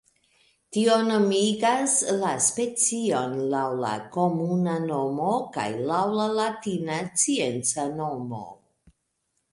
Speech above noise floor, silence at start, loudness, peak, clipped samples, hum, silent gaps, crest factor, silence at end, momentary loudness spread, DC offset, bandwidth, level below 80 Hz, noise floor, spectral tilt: 51 dB; 0.7 s; -25 LUFS; -8 dBFS; under 0.1%; none; none; 16 dB; 1 s; 8 LU; under 0.1%; 11.5 kHz; -68 dBFS; -76 dBFS; -4 dB/octave